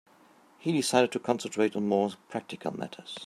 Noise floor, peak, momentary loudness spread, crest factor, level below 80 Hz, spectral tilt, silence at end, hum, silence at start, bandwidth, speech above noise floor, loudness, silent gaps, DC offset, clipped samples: -59 dBFS; -8 dBFS; 13 LU; 22 dB; -76 dBFS; -4.5 dB/octave; 0 s; none; 0.6 s; 16 kHz; 30 dB; -29 LUFS; none; under 0.1%; under 0.1%